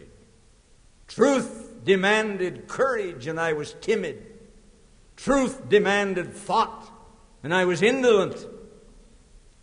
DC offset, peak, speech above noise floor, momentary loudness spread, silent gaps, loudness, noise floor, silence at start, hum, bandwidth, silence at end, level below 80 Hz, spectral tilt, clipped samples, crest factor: under 0.1%; -6 dBFS; 33 dB; 15 LU; none; -24 LUFS; -56 dBFS; 1.1 s; none; 10.5 kHz; 0.95 s; -54 dBFS; -4.5 dB/octave; under 0.1%; 18 dB